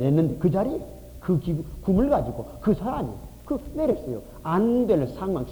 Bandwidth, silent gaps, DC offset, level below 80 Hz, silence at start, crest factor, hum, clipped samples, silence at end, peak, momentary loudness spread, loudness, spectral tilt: over 20 kHz; none; under 0.1%; -42 dBFS; 0 s; 16 dB; none; under 0.1%; 0 s; -8 dBFS; 12 LU; -25 LUFS; -9.5 dB/octave